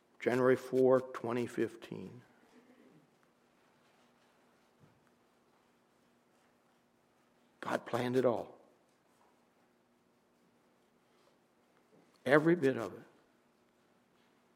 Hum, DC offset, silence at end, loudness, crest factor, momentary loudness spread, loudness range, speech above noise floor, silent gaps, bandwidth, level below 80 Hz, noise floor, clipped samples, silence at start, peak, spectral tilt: none; under 0.1%; 1.55 s; -33 LUFS; 28 dB; 18 LU; 13 LU; 40 dB; none; 15 kHz; -84 dBFS; -72 dBFS; under 0.1%; 0.2 s; -10 dBFS; -7 dB/octave